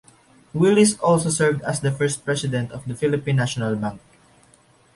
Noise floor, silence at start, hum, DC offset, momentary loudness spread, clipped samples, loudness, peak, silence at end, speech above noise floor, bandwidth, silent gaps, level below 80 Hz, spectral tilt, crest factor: -56 dBFS; 0.55 s; none; under 0.1%; 11 LU; under 0.1%; -21 LUFS; -4 dBFS; 0.95 s; 35 dB; 11.5 kHz; none; -54 dBFS; -5 dB/octave; 16 dB